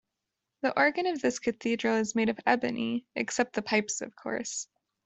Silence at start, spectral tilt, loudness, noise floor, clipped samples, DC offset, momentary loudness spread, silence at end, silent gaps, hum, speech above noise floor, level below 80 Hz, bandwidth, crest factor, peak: 0.65 s; -3.5 dB/octave; -29 LUFS; -86 dBFS; under 0.1%; under 0.1%; 9 LU; 0.4 s; none; none; 57 dB; -70 dBFS; 8.2 kHz; 22 dB; -8 dBFS